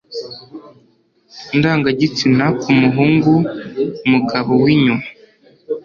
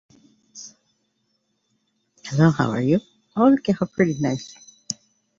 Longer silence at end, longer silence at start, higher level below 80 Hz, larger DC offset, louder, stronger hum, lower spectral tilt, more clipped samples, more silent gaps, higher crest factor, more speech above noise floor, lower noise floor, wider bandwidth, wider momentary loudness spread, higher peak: second, 0.05 s vs 0.45 s; second, 0.1 s vs 0.55 s; first, -52 dBFS vs -58 dBFS; neither; first, -15 LUFS vs -22 LUFS; neither; about the same, -7 dB/octave vs -6.5 dB/octave; neither; neither; about the same, 14 dB vs 18 dB; second, 34 dB vs 52 dB; second, -48 dBFS vs -71 dBFS; about the same, 7.2 kHz vs 7.8 kHz; second, 16 LU vs 22 LU; about the same, -2 dBFS vs -4 dBFS